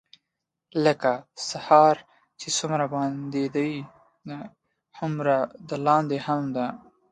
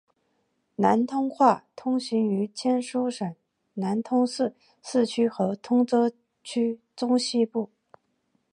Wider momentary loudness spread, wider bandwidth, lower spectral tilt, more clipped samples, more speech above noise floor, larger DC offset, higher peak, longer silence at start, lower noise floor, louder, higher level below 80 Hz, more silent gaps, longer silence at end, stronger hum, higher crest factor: first, 19 LU vs 11 LU; about the same, 11 kHz vs 10.5 kHz; about the same, -5 dB/octave vs -5.5 dB/octave; neither; first, 59 dB vs 48 dB; neither; about the same, -4 dBFS vs -6 dBFS; about the same, 0.75 s vs 0.8 s; first, -83 dBFS vs -73 dBFS; about the same, -25 LUFS vs -26 LUFS; first, -70 dBFS vs -76 dBFS; neither; second, 0.35 s vs 0.85 s; neither; about the same, 22 dB vs 20 dB